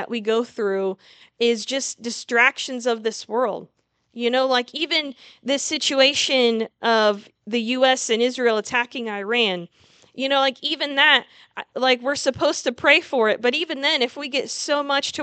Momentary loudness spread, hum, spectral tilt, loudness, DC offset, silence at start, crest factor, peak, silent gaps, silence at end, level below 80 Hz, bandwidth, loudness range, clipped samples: 11 LU; none; -2 dB/octave; -20 LUFS; under 0.1%; 0 s; 20 dB; -2 dBFS; none; 0 s; -70 dBFS; 9.2 kHz; 3 LU; under 0.1%